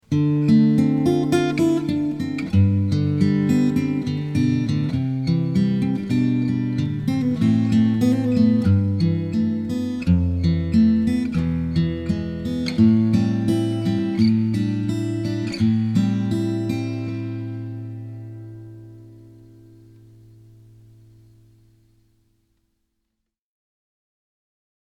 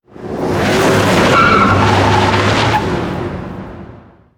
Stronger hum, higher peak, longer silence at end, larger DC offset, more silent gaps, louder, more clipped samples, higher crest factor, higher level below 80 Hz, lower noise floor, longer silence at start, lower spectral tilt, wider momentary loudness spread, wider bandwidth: neither; second, -4 dBFS vs 0 dBFS; first, 5.6 s vs 0.4 s; neither; neither; second, -20 LUFS vs -12 LUFS; neither; about the same, 16 dB vs 12 dB; second, -44 dBFS vs -32 dBFS; first, -79 dBFS vs -38 dBFS; about the same, 0.1 s vs 0.15 s; first, -8 dB/octave vs -5.5 dB/octave; second, 9 LU vs 17 LU; second, 12.5 kHz vs 18.5 kHz